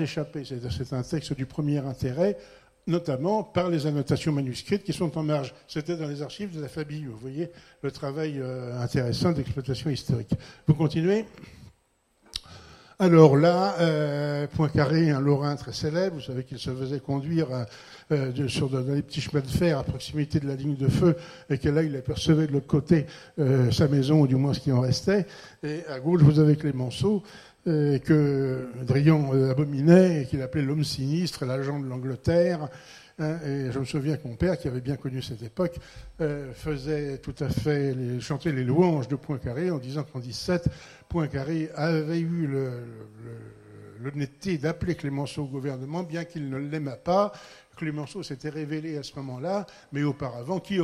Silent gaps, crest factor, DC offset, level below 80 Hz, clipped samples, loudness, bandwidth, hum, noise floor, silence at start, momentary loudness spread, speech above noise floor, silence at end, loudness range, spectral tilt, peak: none; 24 dB; under 0.1%; -50 dBFS; under 0.1%; -26 LUFS; 13 kHz; none; -68 dBFS; 0 s; 13 LU; 42 dB; 0 s; 8 LU; -7.5 dB/octave; -2 dBFS